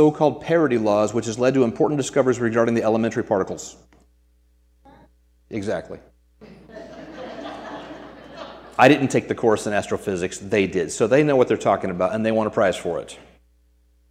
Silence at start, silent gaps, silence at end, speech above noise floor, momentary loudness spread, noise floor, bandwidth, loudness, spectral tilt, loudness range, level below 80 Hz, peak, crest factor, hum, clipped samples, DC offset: 0 s; none; 0.9 s; 39 dB; 21 LU; -59 dBFS; 14.5 kHz; -21 LUFS; -5.5 dB/octave; 15 LU; -56 dBFS; 0 dBFS; 22 dB; none; under 0.1%; under 0.1%